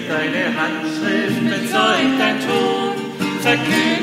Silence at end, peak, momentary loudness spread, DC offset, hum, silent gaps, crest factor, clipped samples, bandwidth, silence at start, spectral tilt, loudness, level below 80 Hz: 0 s; -2 dBFS; 6 LU; under 0.1%; none; none; 16 dB; under 0.1%; 16 kHz; 0 s; -4.5 dB/octave; -18 LUFS; -60 dBFS